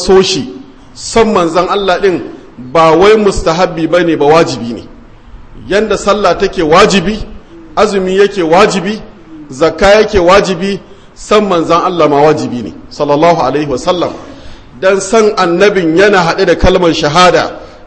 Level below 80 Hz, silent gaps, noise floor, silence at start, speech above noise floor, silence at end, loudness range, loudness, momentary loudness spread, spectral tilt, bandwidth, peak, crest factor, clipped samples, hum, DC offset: -28 dBFS; none; -33 dBFS; 0 s; 24 dB; 0.15 s; 2 LU; -9 LUFS; 13 LU; -4.5 dB/octave; 11 kHz; 0 dBFS; 10 dB; 1%; none; 0.7%